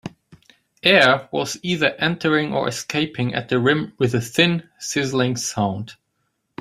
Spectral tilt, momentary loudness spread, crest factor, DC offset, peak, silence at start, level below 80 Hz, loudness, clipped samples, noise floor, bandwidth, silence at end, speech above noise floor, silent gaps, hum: -4.5 dB/octave; 10 LU; 20 dB; under 0.1%; 0 dBFS; 0.05 s; -58 dBFS; -20 LUFS; under 0.1%; -72 dBFS; 15.5 kHz; 0.65 s; 52 dB; none; none